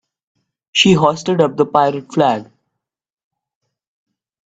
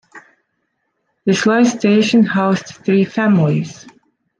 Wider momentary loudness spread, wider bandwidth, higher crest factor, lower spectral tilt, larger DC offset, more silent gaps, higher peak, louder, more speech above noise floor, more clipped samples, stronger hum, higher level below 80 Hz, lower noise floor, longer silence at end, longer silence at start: about the same, 6 LU vs 8 LU; about the same, 9 kHz vs 9.4 kHz; about the same, 18 dB vs 14 dB; about the same, -5 dB/octave vs -6 dB/octave; neither; neither; about the same, 0 dBFS vs -2 dBFS; about the same, -15 LUFS vs -15 LUFS; first, 63 dB vs 56 dB; neither; neither; first, -54 dBFS vs -62 dBFS; first, -77 dBFS vs -70 dBFS; first, 2.05 s vs 0.65 s; first, 0.75 s vs 0.15 s